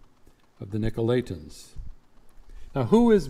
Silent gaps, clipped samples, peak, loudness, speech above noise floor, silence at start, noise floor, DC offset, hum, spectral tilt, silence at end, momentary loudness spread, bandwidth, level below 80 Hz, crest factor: none; under 0.1%; -6 dBFS; -25 LUFS; 32 dB; 0.6 s; -55 dBFS; under 0.1%; none; -7.5 dB/octave; 0 s; 24 LU; 13 kHz; -42 dBFS; 22 dB